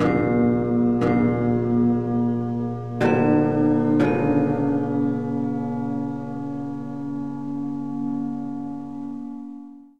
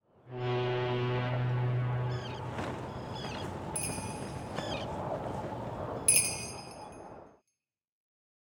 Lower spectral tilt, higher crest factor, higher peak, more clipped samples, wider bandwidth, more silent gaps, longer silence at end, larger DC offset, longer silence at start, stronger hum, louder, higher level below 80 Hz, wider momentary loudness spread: first, -9.5 dB/octave vs -4 dB/octave; second, 16 dB vs 26 dB; first, -6 dBFS vs -10 dBFS; neither; second, 6.6 kHz vs 19 kHz; neither; second, 0 s vs 1.15 s; first, 0.6% vs under 0.1%; second, 0 s vs 0.25 s; neither; first, -23 LUFS vs -33 LUFS; first, -50 dBFS vs -56 dBFS; second, 12 LU vs 16 LU